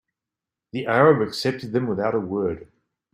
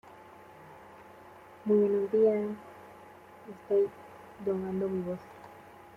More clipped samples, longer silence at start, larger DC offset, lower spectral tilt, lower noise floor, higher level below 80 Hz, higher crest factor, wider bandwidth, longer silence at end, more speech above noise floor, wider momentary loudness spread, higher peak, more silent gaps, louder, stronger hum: neither; first, 0.75 s vs 0.05 s; neither; second, -6.5 dB/octave vs -9 dB/octave; first, -88 dBFS vs -52 dBFS; first, -60 dBFS vs -70 dBFS; about the same, 20 dB vs 16 dB; first, 15 kHz vs 5.8 kHz; first, 0.5 s vs 0.25 s; first, 66 dB vs 23 dB; second, 13 LU vs 26 LU; first, -2 dBFS vs -16 dBFS; neither; first, -22 LUFS vs -30 LUFS; neither